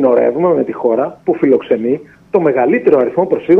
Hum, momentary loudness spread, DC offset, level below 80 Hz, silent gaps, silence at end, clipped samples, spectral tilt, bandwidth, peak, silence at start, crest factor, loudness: none; 6 LU; under 0.1%; -56 dBFS; none; 0 s; under 0.1%; -9.5 dB/octave; 3.9 kHz; 0 dBFS; 0 s; 12 dB; -14 LUFS